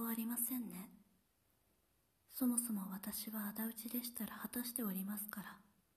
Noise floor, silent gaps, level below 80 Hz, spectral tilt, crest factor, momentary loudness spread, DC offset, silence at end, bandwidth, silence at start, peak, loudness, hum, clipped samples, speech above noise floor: -79 dBFS; none; -80 dBFS; -3.5 dB/octave; 24 dB; 13 LU; under 0.1%; 0.35 s; 14.5 kHz; 0 s; -20 dBFS; -42 LUFS; none; under 0.1%; 36 dB